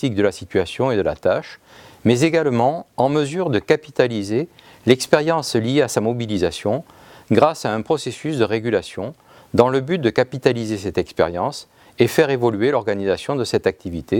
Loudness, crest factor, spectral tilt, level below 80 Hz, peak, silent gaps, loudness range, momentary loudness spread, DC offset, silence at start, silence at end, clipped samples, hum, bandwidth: -20 LUFS; 20 dB; -5.5 dB/octave; -54 dBFS; 0 dBFS; none; 2 LU; 8 LU; under 0.1%; 0 s; 0 s; under 0.1%; none; 17.5 kHz